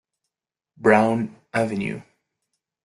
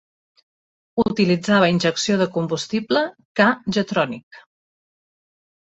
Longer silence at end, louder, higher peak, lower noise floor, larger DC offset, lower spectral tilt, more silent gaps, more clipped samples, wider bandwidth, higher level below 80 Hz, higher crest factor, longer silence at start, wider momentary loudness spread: second, 0.85 s vs 1.4 s; about the same, -22 LUFS vs -20 LUFS; about the same, -2 dBFS vs -2 dBFS; about the same, -87 dBFS vs under -90 dBFS; neither; first, -7 dB/octave vs -5 dB/octave; second, none vs 3.25-3.35 s, 4.23-4.31 s; neither; first, 12 kHz vs 8 kHz; second, -64 dBFS vs -58 dBFS; about the same, 22 dB vs 20 dB; second, 0.8 s vs 0.95 s; first, 12 LU vs 8 LU